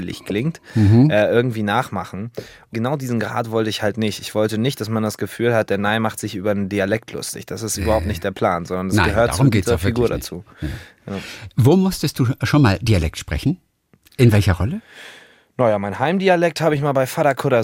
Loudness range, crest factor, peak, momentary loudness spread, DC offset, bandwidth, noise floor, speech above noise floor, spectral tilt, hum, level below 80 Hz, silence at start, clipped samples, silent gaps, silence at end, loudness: 3 LU; 16 dB; -2 dBFS; 15 LU; under 0.1%; 17 kHz; -55 dBFS; 36 dB; -6 dB/octave; none; -40 dBFS; 0 s; under 0.1%; none; 0 s; -19 LUFS